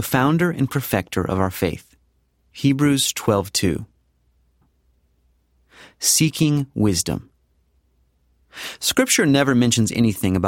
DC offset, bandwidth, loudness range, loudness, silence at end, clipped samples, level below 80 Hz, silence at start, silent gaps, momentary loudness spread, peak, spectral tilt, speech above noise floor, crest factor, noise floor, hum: under 0.1%; 17.5 kHz; 3 LU; -19 LUFS; 0 s; under 0.1%; -48 dBFS; 0 s; none; 9 LU; -4 dBFS; -4 dB/octave; 44 dB; 18 dB; -63 dBFS; none